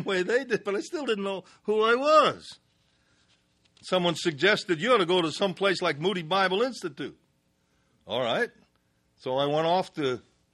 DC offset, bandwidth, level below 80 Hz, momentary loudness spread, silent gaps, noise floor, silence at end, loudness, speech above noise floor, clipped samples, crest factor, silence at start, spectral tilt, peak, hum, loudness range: under 0.1%; 12 kHz; -72 dBFS; 13 LU; none; -70 dBFS; 0.35 s; -26 LUFS; 44 dB; under 0.1%; 20 dB; 0 s; -4.5 dB/octave; -8 dBFS; none; 5 LU